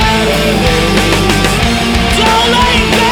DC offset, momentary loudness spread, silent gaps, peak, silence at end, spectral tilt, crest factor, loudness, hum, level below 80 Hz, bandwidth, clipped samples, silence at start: under 0.1%; 3 LU; none; 0 dBFS; 0 s; -4 dB/octave; 10 dB; -9 LUFS; none; -20 dBFS; over 20 kHz; under 0.1%; 0 s